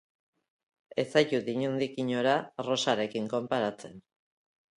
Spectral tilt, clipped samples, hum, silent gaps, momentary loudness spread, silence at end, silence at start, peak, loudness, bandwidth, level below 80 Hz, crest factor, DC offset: -4.5 dB/octave; under 0.1%; none; none; 8 LU; 0.75 s; 0.95 s; -10 dBFS; -30 LUFS; 11 kHz; -76 dBFS; 22 dB; under 0.1%